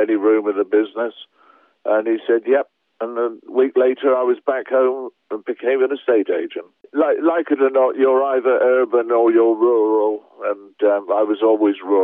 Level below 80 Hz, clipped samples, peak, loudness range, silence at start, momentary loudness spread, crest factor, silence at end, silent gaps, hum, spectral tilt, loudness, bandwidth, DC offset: under -90 dBFS; under 0.1%; -4 dBFS; 4 LU; 0 s; 11 LU; 14 dB; 0 s; none; none; -8.5 dB/octave; -18 LUFS; 3.8 kHz; under 0.1%